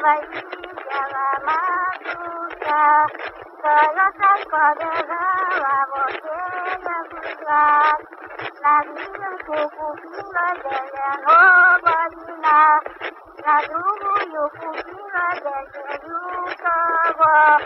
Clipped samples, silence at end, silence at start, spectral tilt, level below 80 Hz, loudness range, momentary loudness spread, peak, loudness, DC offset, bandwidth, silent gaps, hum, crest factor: under 0.1%; 0 s; 0 s; -5.5 dB/octave; -62 dBFS; 7 LU; 17 LU; -2 dBFS; -18 LUFS; under 0.1%; 5.8 kHz; none; none; 16 dB